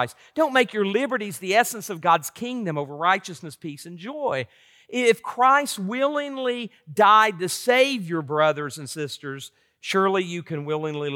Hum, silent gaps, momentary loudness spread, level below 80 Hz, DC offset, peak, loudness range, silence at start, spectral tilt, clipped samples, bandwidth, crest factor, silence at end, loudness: none; none; 17 LU; -78 dBFS; under 0.1%; -6 dBFS; 5 LU; 0 s; -4 dB/octave; under 0.1%; 18 kHz; 18 dB; 0 s; -23 LUFS